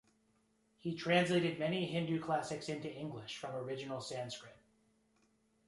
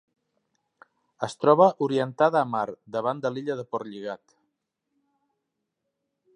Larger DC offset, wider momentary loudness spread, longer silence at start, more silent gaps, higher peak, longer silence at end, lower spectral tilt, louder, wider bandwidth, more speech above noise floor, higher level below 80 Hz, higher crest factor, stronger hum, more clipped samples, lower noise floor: neither; second, 13 LU vs 16 LU; second, 0.85 s vs 1.2 s; neither; second, -18 dBFS vs -4 dBFS; second, 1.15 s vs 2.2 s; about the same, -5.5 dB/octave vs -6.5 dB/octave; second, -38 LUFS vs -25 LUFS; about the same, 11.5 kHz vs 10.5 kHz; second, 38 dB vs 57 dB; about the same, -76 dBFS vs -76 dBFS; about the same, 22 dB vs 24 dB; neither; neither; second, -75 dBFS vs -81 dBFS